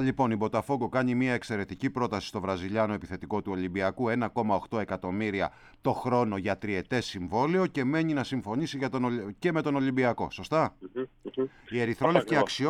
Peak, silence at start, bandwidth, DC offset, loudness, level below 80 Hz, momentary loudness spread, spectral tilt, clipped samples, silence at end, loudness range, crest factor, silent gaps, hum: -6 dBFS; 0 s; 13 kHz; under 0.1%; -30 LUFS; -58 dBFS; 7 LU; -6.5 dB/octave; under 0.1%; 0 s; 2 LU; 24 dB; none; none